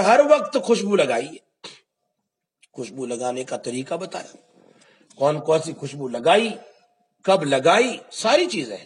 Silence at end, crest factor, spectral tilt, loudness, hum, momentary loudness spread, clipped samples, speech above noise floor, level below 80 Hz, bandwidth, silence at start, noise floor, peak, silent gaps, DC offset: 0 s; 20 dB; -4 dB/octave; -21 LUFS; none; 18 LU; under 0.1%; 59 dB; -78 dBFS; 11 kHz; 0 s; -80 dBFS; -2 dBFS; none; under 0.1%